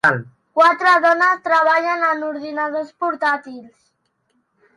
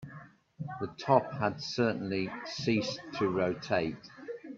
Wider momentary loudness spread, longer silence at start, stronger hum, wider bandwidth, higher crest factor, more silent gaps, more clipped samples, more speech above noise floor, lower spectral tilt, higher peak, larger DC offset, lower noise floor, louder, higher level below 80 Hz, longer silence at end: second, 12 LU vs 17 LU; about the same, 0.05 s vs 0 s; neither; first, 11.5 kHz vs 7.8 kHz; second, 16 dB vs 24 dB; neither; neither; first, 50 dB vs 21 dB; about the same, -5 dB/octave vs -6 dB/octave; first, -2 dBFS vs -8 dBFS; neither; first, -67 dBFS vs -52 dBFS; first, -17 LUFS vs -32 LUFS; about the same, -68 dBFS vs -66 dBFS; first, 1.1 s vs 0 s